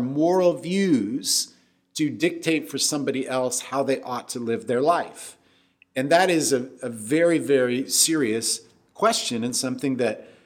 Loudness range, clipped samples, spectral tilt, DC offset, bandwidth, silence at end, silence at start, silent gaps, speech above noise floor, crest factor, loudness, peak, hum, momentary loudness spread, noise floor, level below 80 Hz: 4 LU; under 0.1%; -3.5 dB/octave; under 0.1%; 18 kHz; 0.2 s; 0 s; none; 37 dB; 20 dB; -23 LUFS; -4 dBFS; none; 10 LU; -60 dBFS; -74 dBFS